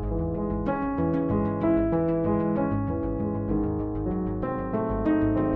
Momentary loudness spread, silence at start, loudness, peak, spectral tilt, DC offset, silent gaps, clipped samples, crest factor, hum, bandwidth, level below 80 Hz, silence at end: 5 LU; 0 s; -27 LUFS; -12 dBFS; -12 dB/octave; under 0.1%; none; under 0.1%; 14 dB; none; 4 kHz; -38 dBFS; 0 s